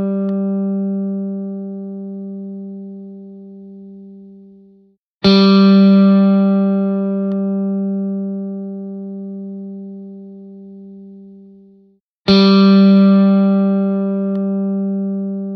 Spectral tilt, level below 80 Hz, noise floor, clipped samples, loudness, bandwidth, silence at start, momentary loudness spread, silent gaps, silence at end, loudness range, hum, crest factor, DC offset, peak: -9 dB/octave; -56 dBFS; -53 dBFS; under 0.1%; -14 LUFS; 6 kHz; 0 s; 26 LU; 4.98-5.21 s, 12.00-12.25 s; 0 s; 18 LU; none; 16 dB; under 0.1%; 0 dBFS